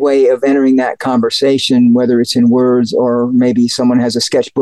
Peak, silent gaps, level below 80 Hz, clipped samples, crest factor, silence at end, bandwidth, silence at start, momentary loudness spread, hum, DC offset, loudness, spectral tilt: -4 dBFS; none; -58 dBFS; under 0.1%; 8 dB; 0 s; 12.5 kHz; 0 s; 4 LU; none; 0.2%; -11 LUFS; -5 dB/octave